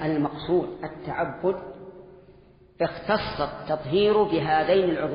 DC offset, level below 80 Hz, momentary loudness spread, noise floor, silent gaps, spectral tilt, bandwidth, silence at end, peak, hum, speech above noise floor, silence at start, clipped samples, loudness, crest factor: under 0.1%; -52 dBFS; 13 LU; -53 dBFS; none; -4.5 dB/octave; 5.4 kHz; 0 s; -10 dBFS; none; 28 dB; 0 s; under 0.1%; -25 LUFS; 16 dB